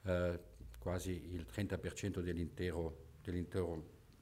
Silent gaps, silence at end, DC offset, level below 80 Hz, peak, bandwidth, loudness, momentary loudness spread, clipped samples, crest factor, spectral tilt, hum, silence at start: none; 0 s; under 0.1%; -56 dBFS; -26 dBFS; 16 kHz; -43 LUFS; 8 LU; under 0.1%; 16 dB; -6.5 dB/octave; none; 0.05 s